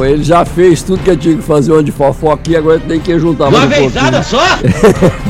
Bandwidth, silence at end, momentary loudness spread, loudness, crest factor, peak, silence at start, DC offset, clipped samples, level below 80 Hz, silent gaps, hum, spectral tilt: 15.5 kHz; 0 s; 4 LU; -9 LUFS; 8 dB; 0 dBFS; 0 s; under 0.1%; 0.8%; -26 dBFS; none; none; -6 dB/octave